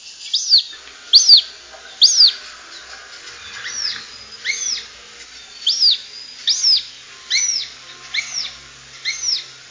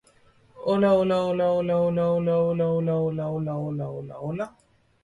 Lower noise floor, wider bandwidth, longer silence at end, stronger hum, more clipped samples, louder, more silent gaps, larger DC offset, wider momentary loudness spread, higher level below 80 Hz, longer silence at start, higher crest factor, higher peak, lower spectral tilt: second, -39 dBFS vs -58 dBFS; second, 7.8 kHz vs 10.5 kHz; second, 0.15 s vs 0.55 s; neither; neither; first, -14 LUFS vs -25 LUFS; neither; neither; first, 25 LU vs 13 LU; about the same, -62 dBFS vs -58 dBFS; second, 0.05 s vs 0.55 s; first, 20 dB vs 14 dB; first, 0 dBFS vs -10 dBFS; second, 4 dB/octave vs -9 dB/octave